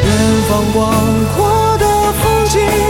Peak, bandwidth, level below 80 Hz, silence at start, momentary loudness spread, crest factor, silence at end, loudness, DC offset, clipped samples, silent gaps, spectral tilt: 0 dBFS; 17 kHz; -24 dBFS; 0 s; 1 LU; 12 dB; 0 s; -12 LUFS; under 0.1%; under 0.1%; none; -5 dB/octave